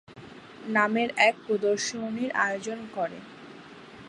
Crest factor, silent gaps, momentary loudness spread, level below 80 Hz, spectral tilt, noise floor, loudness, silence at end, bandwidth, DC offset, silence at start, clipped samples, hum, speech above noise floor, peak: 22 dB; none; 24 LU; -72 dBFS; -3.5 dB/octave; -47 dBFS; -27 LUFS; 0 s; 11 kHz; under 0.1%; 0.1 s; under 0.1%; none; 20 dB; -6 dBFS